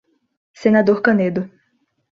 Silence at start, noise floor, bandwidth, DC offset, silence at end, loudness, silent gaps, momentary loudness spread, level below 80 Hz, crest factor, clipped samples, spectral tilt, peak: 0.6 s; -66 dBFS; 7 kHz; under 0.1%; 0.7 s; -17 LUFS; none; 12 LU; -62 dBFS; 18 dB; under 0.1%; -8 dB/octave; -2 dBFS